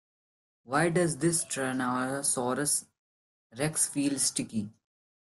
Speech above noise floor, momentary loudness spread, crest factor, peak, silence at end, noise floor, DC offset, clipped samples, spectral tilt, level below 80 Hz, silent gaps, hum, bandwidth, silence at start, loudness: over 61 dB; 6 LU; 20 dB; -12 dBFS; 0.7 s; under -90 dBFS; under 0.1%; under 0.1%; -3.5 dB/octave; -66 dBFS; 2.99-3.50 s; none; 12.5 kHz; 0.7 s; -29 LUFS